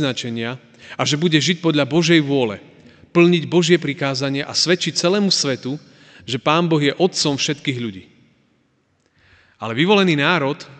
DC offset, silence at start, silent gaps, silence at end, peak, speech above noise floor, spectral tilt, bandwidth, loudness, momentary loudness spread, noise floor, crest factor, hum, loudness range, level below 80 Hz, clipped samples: under 0.1%; 0 s; none; 0.05 s; 0 dBFS; 45 dB; -4.5 dB/octave; 9.2 kHz; -18 LUFS; 13 LU; -63 dBFS; 18 dB; none; 4 LU; -64 dBFS; under 0.1%